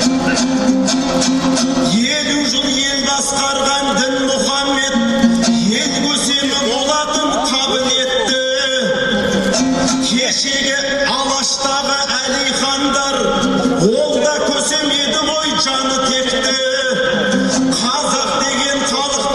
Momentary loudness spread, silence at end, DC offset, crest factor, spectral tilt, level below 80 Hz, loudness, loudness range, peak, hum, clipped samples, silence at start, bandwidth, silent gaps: 1 LU; 0 s; under 0.1%; 16 dB; -2.5 dB/octave; -42 dBFS; -14 LUFS; 0 LU; 0 dBFS; none; under 0.1%; 0 s; 12.5 kHz; none